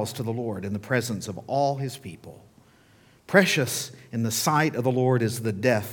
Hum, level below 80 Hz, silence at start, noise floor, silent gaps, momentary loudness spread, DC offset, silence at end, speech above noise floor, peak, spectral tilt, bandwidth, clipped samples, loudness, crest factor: none; -66 dBFS; 0 s; -57 dBFS; none; 12 LU; under 0.1%; 0 s; 32 dB; -2 dBFS; -4.5 dB/octave; 19 kHz; under 0.1%; -25 LUFS; 24 dB